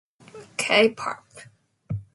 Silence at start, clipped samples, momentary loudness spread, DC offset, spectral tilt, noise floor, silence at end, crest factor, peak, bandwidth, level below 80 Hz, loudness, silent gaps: 0.35 s; under 0.1%; 16 LU; under 0.1%; -3.5 dB/octave; -47 dBFS; 0.1 s; 22 dB; -4 dBFS; 11.5 kHz; -58 dBFS; -23 LUFS; none